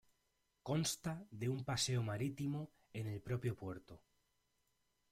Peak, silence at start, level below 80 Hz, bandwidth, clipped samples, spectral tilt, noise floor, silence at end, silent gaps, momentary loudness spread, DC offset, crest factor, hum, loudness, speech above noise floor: -26 dBFS; 0.65 s; -70 dBFS; 16 kHz; under 0.1%; -4.5 dB/octave; -83 dBFS; 1.15 s; none; 12 LU; under 0.1%; 18 dB; none; -42 LUFS; 41 dB